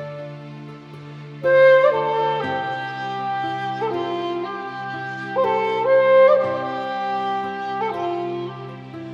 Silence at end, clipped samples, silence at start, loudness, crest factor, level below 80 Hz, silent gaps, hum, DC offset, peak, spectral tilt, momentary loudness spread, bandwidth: 0 s; under 0.1%; 0 s; -20 LUFS; 16 dB; -70 dBFS; none; none; under 0.1%; -4 dBFS; -6.5 dB/octave; 21 LU; 6.8 kHz